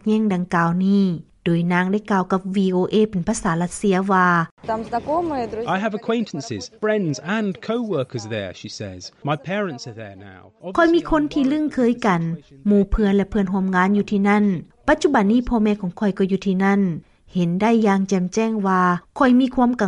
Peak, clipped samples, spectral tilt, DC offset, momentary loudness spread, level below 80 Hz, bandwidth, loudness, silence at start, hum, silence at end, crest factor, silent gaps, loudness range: -4 dBFS; under 0.1%; -6.5 dB/octave; under 0.1%; 11 LU; -40 dBFS; 11 kHz; -20 LUFS; 0.05 s; none; 0 s; 14 dB; 4.51-4.57 s; 6 LU